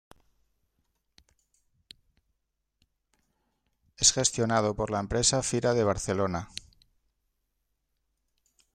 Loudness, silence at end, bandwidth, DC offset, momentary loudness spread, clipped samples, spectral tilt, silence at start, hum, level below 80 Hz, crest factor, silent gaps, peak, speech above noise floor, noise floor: -26 LUFS; 2.3 s; 15.5 kHz; under 0.1%; 10 LU; under 0.1%; -3 dB/octave; 4 s; none; -52 dBFS; 26 dB; none; -6 dBFS; 54 dB; -80 dBFS